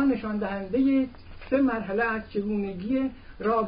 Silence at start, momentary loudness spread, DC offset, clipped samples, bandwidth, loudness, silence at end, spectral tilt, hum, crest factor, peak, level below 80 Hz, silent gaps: 0 s; 8 LU; under 0.1%; under 0.1%; 5.2 kHz; -27 LUFS; 0 s; -11 dB/octave; none; 14 dB; -12 dBFS; -50 dBFS; none